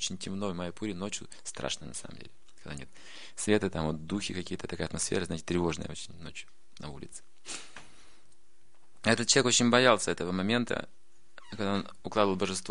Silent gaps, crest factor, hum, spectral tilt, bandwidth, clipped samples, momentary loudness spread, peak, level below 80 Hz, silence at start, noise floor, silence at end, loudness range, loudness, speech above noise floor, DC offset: none; 26 dB; none; -3.5 dB/octave; 10.5 kHz; under 0.1%; 23 LU; -6 dBFS; -58 dBFS; 0 s; -69 dBFS; 0 s; 11 LU; -30 LUFS; 38 dB; 0.7%